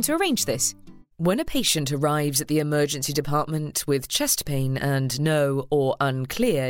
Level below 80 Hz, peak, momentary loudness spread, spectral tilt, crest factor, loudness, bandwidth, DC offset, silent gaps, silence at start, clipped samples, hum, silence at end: -48 dBFS; -6 dBFS; 3 LU; -4 dB/octave; 16 dB; -23 LUFS; 17 kHz; under 0.1%; none; 0 s; under 0.1%; none; 0 s